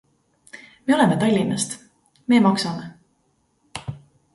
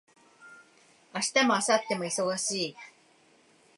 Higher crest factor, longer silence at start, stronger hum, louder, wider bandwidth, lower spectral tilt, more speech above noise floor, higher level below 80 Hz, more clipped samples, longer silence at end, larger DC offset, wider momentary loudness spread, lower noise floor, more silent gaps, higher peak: about the same, 20 dB vs 22 dB; first, 0.55 s vs 0.4 s; neither; first, -20 LUFS vs -28 LUFS; about the same, 11.5 kHz vs 11.5 kHz; first, -5 dB/octave vs -2.5 dB/octave; first, 48 dB vs 34 dB; first, -58 dBFS vs -84 dBFS; neither; second, 0.4 s vs 0.9 s; neither; first, 21 LU vs 12 LU; first, -66 dBFS vs -62 dBFS; neither; first, -4 dBFS vs -10 dBFS